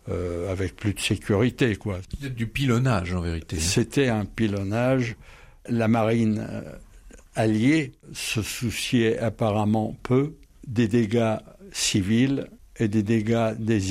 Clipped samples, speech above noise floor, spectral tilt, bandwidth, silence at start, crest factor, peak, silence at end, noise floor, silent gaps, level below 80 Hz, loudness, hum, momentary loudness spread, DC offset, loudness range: under 0.1%; 24 dB; -5.5 dB/octave; 16 kHz; 0.05 s; 14 dB; -10 dBFS; 0 s; -48 dBFS; none; -46 dBFS; -25 LUFS; none; 11 LU; under 0.1%; 1 LU